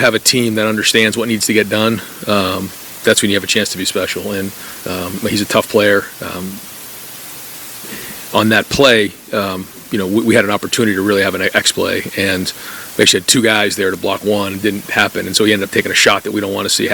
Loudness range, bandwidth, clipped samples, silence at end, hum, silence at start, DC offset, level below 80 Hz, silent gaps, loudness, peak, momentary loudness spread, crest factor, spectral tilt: 4 LU; 19.5 kHz; 0.1%; 0 s; none; 0 s; under 0.1%; -50 dBFS; none; -14 LUFS; 0 dBFS; 15 LU; 16 dB; -3 dB/octave